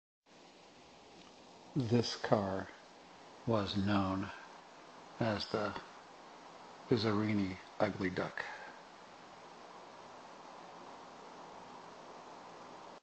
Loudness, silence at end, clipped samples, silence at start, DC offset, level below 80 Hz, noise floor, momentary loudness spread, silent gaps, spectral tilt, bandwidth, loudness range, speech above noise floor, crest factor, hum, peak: -36 LUFS; 0.05 s; under 0.1%; 0.35 s; under 0.1%; -64 dBFS; -60 dBFS; 22 LU; none; -6 dB/octave; 8.4 kHz; 16 LU; 25 dB; 26 dB; none; -14 dBFS